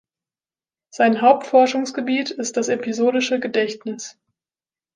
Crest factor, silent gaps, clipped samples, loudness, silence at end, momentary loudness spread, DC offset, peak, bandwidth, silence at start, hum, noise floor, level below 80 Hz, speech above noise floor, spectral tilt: 18 dB; none; under 0.1%; -19 LUFS; 0.85 s; 13 LU; under 0.1%; -2 dBFS; 10 kHz; 0.95 s; none; under -90 dBFS; -74 dBFS; over 71 dB; -3.5 dB/octave